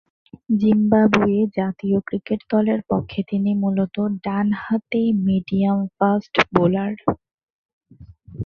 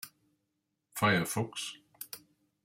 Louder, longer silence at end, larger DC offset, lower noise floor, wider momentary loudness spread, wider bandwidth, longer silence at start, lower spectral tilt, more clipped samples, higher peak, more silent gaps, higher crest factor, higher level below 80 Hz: first, -20 LUFS vs -32 LUFS; second, 0 s vs 0.45 s; neither; second, -45 dBFS vs -83 dBFS; second, 8 LU vs 19 LU; second, 6.6 kHz vs 16.5 kHz; first, 0.5 s vs 0.05 s; first, -8 dB/octave vs -4 dB/octave; neither; first, 0 dBFS vs -14 dBFS; first, 7.34-7.81 s vs none; about the same, 20 dB vs 22 dB; first, -50 dBFS vs -72 dBFS